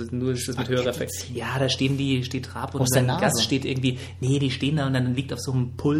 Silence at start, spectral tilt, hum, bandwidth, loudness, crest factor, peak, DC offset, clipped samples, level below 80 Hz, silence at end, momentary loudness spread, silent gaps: 0 s; -5 dB/octave; none; 16 kHz; -25 LUFS; 16 dB; -8 dBFS; under 0.1%; under 0.1%; -54 dBFS; 0 s; 8 LU; none